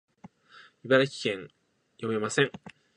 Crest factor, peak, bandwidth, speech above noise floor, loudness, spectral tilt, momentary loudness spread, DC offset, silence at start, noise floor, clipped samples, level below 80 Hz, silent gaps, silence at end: 24 dB; -8 dBFS; 10.5 kHz; 29 dB; -28 LUFS; -4.5 dB/octave; 17 LU; under 0.1%; 0.85 s; -56 dBFS; under 0.1%; -74 dBFS; none; 0.25 s